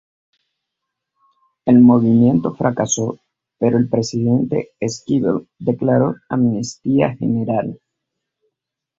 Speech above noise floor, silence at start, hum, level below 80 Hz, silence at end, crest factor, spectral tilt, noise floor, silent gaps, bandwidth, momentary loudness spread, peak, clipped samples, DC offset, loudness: 64 dB; 1.65 s; none; -54 dBFS; 1.25 s; 16 dB; -6.5 dB/octave; -80 dBFS; none; 7.8 kHz; 12 LU; -2 dBFS; under 0.1%; under 0.1%; -17 LUFS